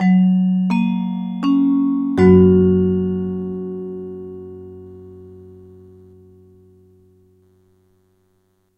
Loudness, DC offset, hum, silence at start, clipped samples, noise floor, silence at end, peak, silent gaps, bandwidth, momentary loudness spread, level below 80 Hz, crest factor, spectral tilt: -16 LUFS; under 0.1%; none; 0 s; under 0.1%; -63 dBFS; 3.25 s; -2 dBFS; none; 5.4 kHz; 24 LU; -52 dBFS; 18 dB; -10 dB/octave